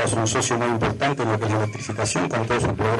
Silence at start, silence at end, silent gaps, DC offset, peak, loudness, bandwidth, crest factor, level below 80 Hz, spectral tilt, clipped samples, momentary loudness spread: 0 s; 0 s; none; under 0.1%; -8 dBFS; -22 LUFS; 11.5 kHz; 14 dB; -46 dBFS; -4.5 dB/octave; under 0.1%; 3 LU